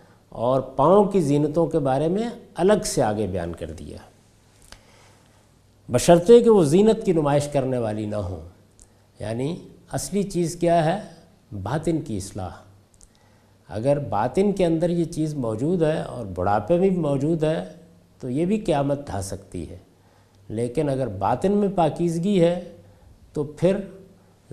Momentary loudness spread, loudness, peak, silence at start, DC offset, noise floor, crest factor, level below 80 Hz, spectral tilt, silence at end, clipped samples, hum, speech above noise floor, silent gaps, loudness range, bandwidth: 17 LU; -22 LUFS; -2 dBFS; 0.35 s; under 0.1%; -56 dBFS; 22 dB; -48 dBFS; -6.5 dB/octave; 0.5 s; under 0.1%; none; 34 dB; none; 8 LU; 14.5 kHz